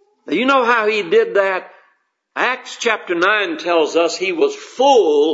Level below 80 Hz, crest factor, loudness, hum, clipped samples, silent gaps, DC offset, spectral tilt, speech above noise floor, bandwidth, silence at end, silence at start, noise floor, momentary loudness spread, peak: -72 dBFS; 16 dB; -16 LUFS; none; under 0.1%; none; under 0.1%; -2.5 dB/octave; 46 dB; 8 kHz; 0 s; 0.25 s; -62 dBFS; 7 LU; 0 dBFS